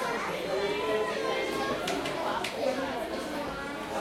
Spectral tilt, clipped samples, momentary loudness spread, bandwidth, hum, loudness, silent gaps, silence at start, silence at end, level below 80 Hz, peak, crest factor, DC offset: -3.5 dB/octave; under 0.1%; 5 LU; 16.5 kHz; none; -31 LUFS; none; 0 s; 0 s; -56 dBFS; -16 dBFS; 14 dB; under 0.1%